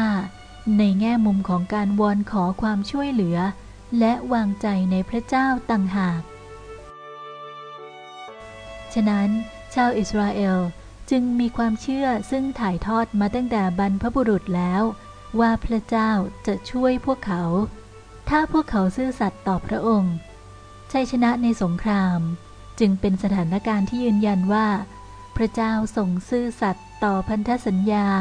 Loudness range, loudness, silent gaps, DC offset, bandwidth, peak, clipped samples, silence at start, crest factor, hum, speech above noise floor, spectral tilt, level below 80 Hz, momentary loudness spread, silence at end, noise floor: 3 LU; -22 LUFS; none; under 0.1%; 10 kHz; -6 dBFS; under 0.1%; 0 s; 16 dB; none; 22 dB; -7.5 dB/octave; -42 dBFS; 17 LU; 0 s; -43 dBFS